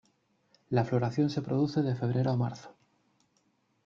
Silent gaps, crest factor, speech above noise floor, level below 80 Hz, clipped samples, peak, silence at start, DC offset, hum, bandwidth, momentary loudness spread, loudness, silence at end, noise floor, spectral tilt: none; 18 dB; 44 dB; -66 dBFS; under 0.1%; -14 dBFS; 0.7 s; under 0.1%; none; 7.2 kHz; 4 LU; -30 LUFS; 1.15 s; -73 dBFS; -8.5 dB/octave